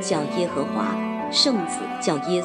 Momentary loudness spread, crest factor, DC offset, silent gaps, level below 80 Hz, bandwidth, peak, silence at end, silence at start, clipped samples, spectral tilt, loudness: 7 LU; 18 dB; under 0.1%; none; -68 dBFS; 11 kHz; -6 dBFS; 0 s; 0 s; under 0.1%; -4 dB/octave; -23 LUFS